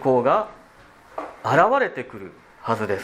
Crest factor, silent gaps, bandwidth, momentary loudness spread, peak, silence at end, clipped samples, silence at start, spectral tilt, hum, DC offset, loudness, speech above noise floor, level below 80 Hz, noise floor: 22 dB; none; 14.5 kHz; 20 LU; -2 dBFS; 0 s; under 0.1%; 0 s; -6.5 dB/octave; none; under 0.1%; -21 LUFS; 29 dB; -62 dBFS; -50 dBFS